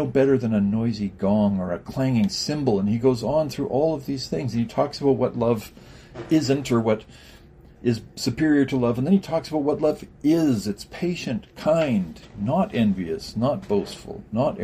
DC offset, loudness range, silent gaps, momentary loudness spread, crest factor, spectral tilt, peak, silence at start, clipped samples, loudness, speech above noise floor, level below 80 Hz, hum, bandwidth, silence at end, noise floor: under 0.1%; 2 LU; none; 8 LU; 16 dB; -6.5 dB/octave; -6 dBFS; 0 s; under 0.1%; -23 LUFS; 25 dB; -50 dBFS; none; 15 kHz; 0 s; -48 dBFS